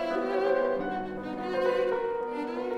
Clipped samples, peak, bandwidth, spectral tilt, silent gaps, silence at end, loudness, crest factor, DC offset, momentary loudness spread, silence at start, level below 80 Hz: under 0.1%; -14 dBFS; 9.6 kHz; -6.5 dB/octave; none; 0 s; -30 LUFS; 14 dB; under 0.1%; 7 LU; 0 s; -60 dBFS